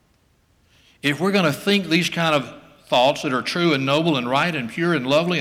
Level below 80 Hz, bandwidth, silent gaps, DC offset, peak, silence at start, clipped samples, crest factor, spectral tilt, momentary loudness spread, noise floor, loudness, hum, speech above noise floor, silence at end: -62 dBFS; 16 kHz; none; under 0.1%; -6 dBFS; 1.05 s; under 0.1%; 14 dB; -5 dB/octave; 5 LU; -61 dBFS; -20 LUFS; none; 41 dB; 0 s